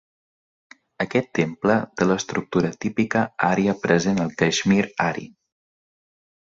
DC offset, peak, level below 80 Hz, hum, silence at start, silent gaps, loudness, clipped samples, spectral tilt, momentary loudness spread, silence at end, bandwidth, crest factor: under 0.1%; -2 dBFS; -56 dBFS; none; 1 s; none; -22 LUFS; under 0.1%; -5.5 dB/octave; 5 LU; 1.2 s; 7.8 kHz; 20 dB